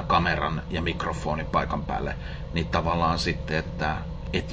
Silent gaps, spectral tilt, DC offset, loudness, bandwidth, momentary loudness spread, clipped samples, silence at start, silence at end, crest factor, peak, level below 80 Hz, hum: none; -6 dB/octave; under 0.1%; -27 LUFS; 8 kHz; 7 LU; under 0.1%; 0 s; 0 s; 20 dB; -8 dBFS; -36 dBFS; none